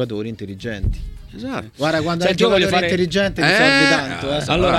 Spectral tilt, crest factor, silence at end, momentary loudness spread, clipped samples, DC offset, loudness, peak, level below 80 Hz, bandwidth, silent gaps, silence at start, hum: -4.5 dB/octave; 16 dB; 0 s; 16 LU; under 0.1%; under 0.1%; -17 LUFS; -2 dBFS; -34 dBFS; 15 kHz; none; 0 s; none